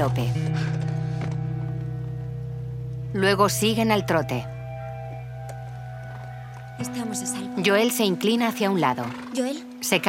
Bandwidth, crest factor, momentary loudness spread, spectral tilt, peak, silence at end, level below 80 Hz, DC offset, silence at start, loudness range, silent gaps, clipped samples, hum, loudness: 16.5 kHz; 20 dB; 16 LU; -5 dB/octave; -4 dBFS; 0 s; -50 dBFS; under 0.1%; 0 s; 6 LU; none; under 0.1%; none; -25 LUFS